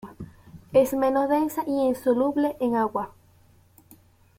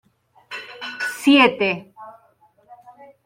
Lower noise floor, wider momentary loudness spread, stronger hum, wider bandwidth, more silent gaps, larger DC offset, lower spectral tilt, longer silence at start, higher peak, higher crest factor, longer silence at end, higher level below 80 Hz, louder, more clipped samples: about the same, -57 dBFS vs -58 dBFS; second, 17 LU vs 21 LU; neither; about the same, 16.5 kHz vs 16 kHz; neither; neither; first, -6 dB/octave vs -4 dB/octave; second, 0.05 s vs 0.5 s; second, -8 dBFS vs -2 dBFS; about the same, 18 dB vs 20 dB; first, 1.3 s vs 1.15 s; first, -58 dBFS vs -68 dBFS; second, -24 LUFS vs -18 LUFS; neither